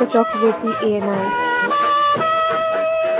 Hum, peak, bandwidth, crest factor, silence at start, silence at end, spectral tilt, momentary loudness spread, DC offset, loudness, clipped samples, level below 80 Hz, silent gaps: none; 0 dBFS; 4 kHz; 16 dB; 0 s; 0 s; -8.5 dB/octave; 4 LU; under 0.1%; -18 LUFS; under 0.1%; -58 dBFS; none